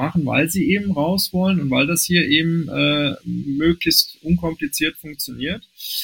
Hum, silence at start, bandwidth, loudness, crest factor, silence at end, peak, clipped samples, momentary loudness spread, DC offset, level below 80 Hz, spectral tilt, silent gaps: none; 0 s; 17 kHz; -19 LUFS; 18 dB; 0 s; 0 dBFS; under 0.1%; 11 LU; under 0.1%; -44 dBFS; -4 dB/octave; none